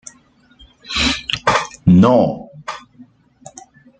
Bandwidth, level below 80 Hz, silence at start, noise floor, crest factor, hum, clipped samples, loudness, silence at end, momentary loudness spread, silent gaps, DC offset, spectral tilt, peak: 9.2 kHz; -40 dBFS; 0.9 s; -52 dBFS; 16 dB; none; under 0.1%; -15 LUFS; 0.95 s; 20 LU; none; under 0.1%; -5.5 dB/octave; -2 dBFS